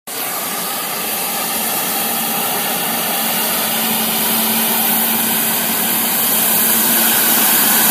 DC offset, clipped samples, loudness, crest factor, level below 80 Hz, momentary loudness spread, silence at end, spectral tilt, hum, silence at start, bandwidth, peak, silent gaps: under 0.1%; under 0.1%; -13 LUFS; 16 dB; -62 dBFS; 8 LU; 0 s; -1 dB/octave; none; 0.05 s; 16 kHz; 0 dBFS; none